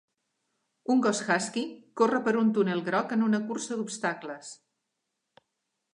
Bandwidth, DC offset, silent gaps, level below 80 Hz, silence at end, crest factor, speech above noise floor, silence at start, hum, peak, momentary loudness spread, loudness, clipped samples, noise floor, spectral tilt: 11 kHz; under 0.1%; none; -84 dBFS; 1.4 s; 18 dB; 55 dB; 0.9 s; none; -12 dBFS; 13 LU; -28 LUFS; under 0.1%; -82 dBFS; -4.5 dB/octave